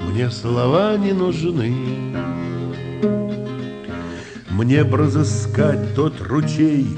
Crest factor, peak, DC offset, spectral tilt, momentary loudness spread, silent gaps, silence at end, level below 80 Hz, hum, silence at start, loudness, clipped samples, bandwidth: 16 dB; -2 dBFS; under 0.1%; -7 dB/octave; 12 LU; none; 0 s; -48 dBFS; none; 0 s; -20 LUFS; under 0.1%; 9.2 kHz